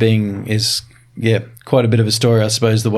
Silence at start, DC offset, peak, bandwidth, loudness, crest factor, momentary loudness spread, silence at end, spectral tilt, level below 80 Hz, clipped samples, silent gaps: 0 s; under 0.1%; -2 dBFS; 14 kHz; -16 LUFS; 14 dB; 6 LU; 0 s; -5 dB/octave; -54 dBFS; under 0.1%; none